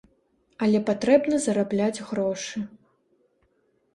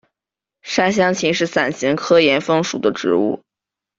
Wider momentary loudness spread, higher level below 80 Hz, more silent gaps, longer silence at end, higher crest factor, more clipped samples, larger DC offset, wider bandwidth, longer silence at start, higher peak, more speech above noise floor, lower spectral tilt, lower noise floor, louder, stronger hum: first, 12 LU vs 9 LU; second, -64 dBFS vs -58 dBFS; neither; first, 1.3 s vs 0.6 s; about the same, 20 dB vs 18 dB; neither; neither; first, 11.5 kHz vs 7.8 kHz; about the same, 0.6 s vs 0.65 s; second, -6 dBFS vs 0 dBFS; second, 45 dB vs 70 dB; about the same, -5.5 dB/octave vs -4.5 dB/octave; second, -68 dBFS vs -87 dBFS; second, -24 LUFS vs -17 LUFS; neither